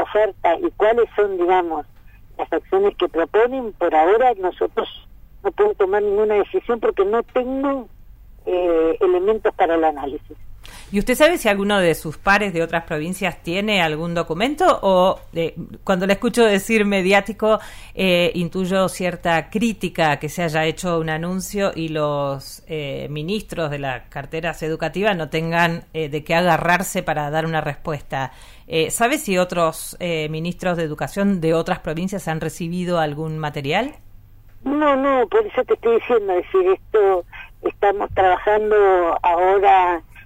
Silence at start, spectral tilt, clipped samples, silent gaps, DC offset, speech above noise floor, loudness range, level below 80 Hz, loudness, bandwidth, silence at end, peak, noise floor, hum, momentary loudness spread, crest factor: 0 s; -5 dB/octave; under 0.1%; none; under 0.1%; 24 dB; 5 LU; -42 dBFS; -19 LUFS; 16 kHz; 0 s; -4 dBFS; -43 dBFS; none; 10 LU; 16 dB